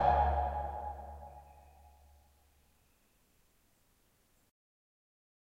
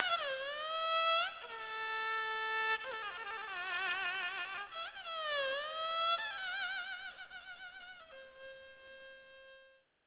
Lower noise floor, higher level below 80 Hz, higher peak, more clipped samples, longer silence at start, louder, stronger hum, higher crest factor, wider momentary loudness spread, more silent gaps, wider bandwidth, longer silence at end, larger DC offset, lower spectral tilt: first, -72 dBFS vs -65 dBFS; first, -46 dBFS vs -78 dBFS; about the same, -16 dBFS vs -14 dBFS; neither; about the same, 0 s vs 0 s; about the same, -35 LUFS vs -37 LUFS; neither; about the same, 22 dB vs 26 dB; first, 23 LU vs 20 LU; neither; first, 8.6 kHz vs 4 kHz; first, 3.9 s vs 0.35 s; neither; first, -7.5 dB/octave vs 4 dB/octave